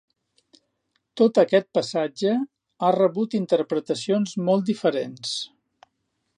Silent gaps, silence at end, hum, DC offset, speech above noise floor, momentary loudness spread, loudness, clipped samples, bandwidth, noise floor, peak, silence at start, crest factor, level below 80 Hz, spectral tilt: none; 0.9 s; none; under 0.1%; 53 dB; 9 LU; -23 LUFS; under 0.1%; 11 kHz; -75 dBFS; -6 dBFS; 1.15 s; 18 dB; -76 dBFS; -5.5 dB/octave